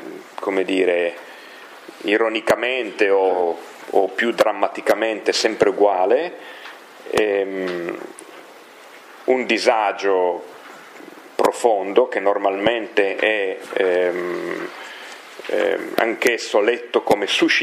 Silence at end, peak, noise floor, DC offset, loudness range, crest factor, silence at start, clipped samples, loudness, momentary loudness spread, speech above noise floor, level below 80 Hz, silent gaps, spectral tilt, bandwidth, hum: 0 s; 0 dBFS; -43 dBFS; under 0.1%; 3 LU; 20 dB; 0 s; under 0.1%; -20 LUFS; 19 LU; 24 dB; -64 dBFS; none; -3 dB/octave; 15.5 kHz; none